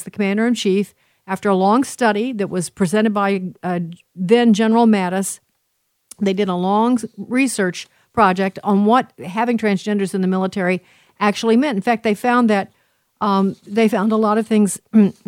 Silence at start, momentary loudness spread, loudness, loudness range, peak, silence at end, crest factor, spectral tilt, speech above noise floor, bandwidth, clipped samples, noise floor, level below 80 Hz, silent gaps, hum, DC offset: 0 s; 9 LU; -18 LUFS; 2 LU; 0 dBFS; 0.15 s; 16 dB; -5.5 dB/octave; 52 dB; 16 kHz; under 0.1%; -69 dBFS; -62 dBFS; none; none; under 0.1%